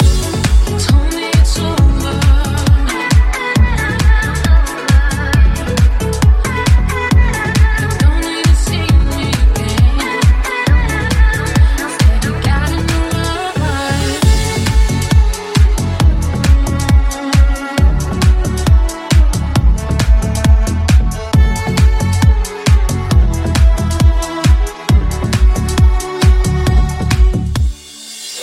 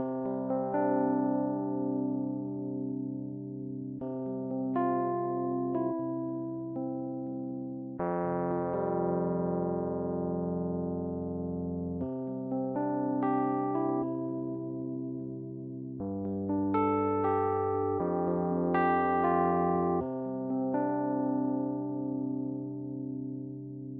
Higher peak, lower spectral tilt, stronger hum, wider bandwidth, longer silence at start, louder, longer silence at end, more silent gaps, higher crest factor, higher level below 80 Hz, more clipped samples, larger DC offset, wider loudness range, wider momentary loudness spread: first, 0 dBFS vs -16 dBFS; second, -5.5 dB/octave vs -9.5 dB/octave; neither; first, 15 kHz vs 3.7 kHz; about the same, 0 s vs 0 s; first, -13 LUFS vs -32 LUFS; about the same, 0 s vs 0 s; neither; second, 10 dB vs 16 dB; first, -12 dBFS vs -64 dBFS; neither; neither; second, 1 LU vs 5 LU; second, 3 LU vs 10 LU